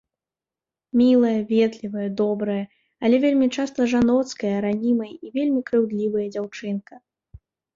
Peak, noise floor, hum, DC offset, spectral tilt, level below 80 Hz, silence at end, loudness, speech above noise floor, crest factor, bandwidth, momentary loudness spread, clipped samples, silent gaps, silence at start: -8 dBFS; under -90 dBFS; none; under 0.1%; -6.5 dB/octave; -58 dBFS; 0.8 s; -22 LUFS; over 69 dB; 14 dB; 7.6 kHz; 11 LU; under 0.1%; none; 0.95 s